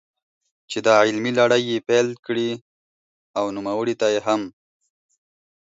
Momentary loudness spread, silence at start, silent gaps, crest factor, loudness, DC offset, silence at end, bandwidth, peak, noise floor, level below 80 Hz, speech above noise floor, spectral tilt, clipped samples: 12 LU; 0.7 s; 2.19-2.23 s, 2.61-3.34 s; 20 dB; -21 LUFS; under 0.1%; 1.15 s; 8 kHz; -2 dBFS; under -90 dBFS; -68 dBFS; over 70 dB; -4.5 dB/octave; under 0.1%